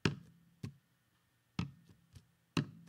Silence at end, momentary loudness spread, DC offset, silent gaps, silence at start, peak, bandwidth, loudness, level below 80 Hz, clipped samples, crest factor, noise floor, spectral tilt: 0.05 s; 24 LU; under 0.1%; none; 0.05 s; -16 dBFS; 15.5 kHz; -44 LUFS; -68 dBFS; under 0.1%; 28 dB; -76 dBFS; -5.5 dB/octave